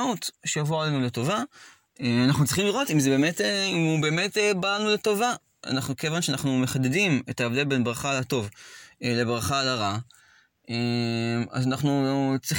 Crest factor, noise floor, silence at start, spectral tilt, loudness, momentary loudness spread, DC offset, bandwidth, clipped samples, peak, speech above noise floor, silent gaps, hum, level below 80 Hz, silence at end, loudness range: 14 dB; -60 dBFS; 0 s; -4.5 dB/octave; -25 LUFS; 7 LU; under 0.1%; 17 kHz; under 0.1%; -10 dBFS; 35 dB; none; none; -60 dBFS; 0 s; 4 LU